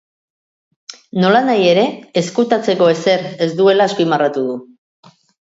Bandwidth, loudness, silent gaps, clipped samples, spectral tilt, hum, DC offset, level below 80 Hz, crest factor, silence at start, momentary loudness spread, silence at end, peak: 8 kHz; -15 LUFS; none; under 0.1%; -5.5 dB/octave; none; under 0.1%; -64 dBFS; 16 dB; 0.9 s; 8 LU; 0.8 s; 0 dBFS